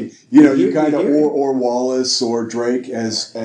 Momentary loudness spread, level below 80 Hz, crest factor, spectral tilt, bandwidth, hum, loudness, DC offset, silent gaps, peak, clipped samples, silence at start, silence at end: 10 LU; -64 dBFS; 14 dB; -4.5 dB/octave; 10 kHz; none; -16 LUFS; under 0.1%; none; 0 dBFS; under 0.1%; 0 s; 0 s